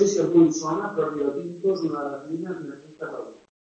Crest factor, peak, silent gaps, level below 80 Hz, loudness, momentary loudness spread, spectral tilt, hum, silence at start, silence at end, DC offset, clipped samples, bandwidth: 18 dB; -6 dBFS; none; -68 dBFS; -24 LUFS; 18 LU; -6 dB/octave; none; 0 s; 0.3 s; under 0.1%; under 0.1%; 8 kHz